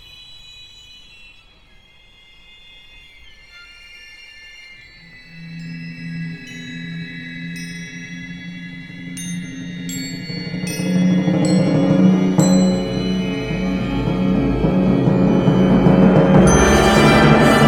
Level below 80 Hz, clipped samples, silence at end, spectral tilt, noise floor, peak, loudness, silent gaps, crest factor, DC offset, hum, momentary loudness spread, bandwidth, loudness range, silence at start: -34 dBFS; under 0.1%; 0 s; -6 dB/octave; -48 dBFS; 0 dBFS; -15 LUFS; none; 18 dB; under 0.1%; none; 26 LU; 13.5 kHz; 20 LU; 0.2 s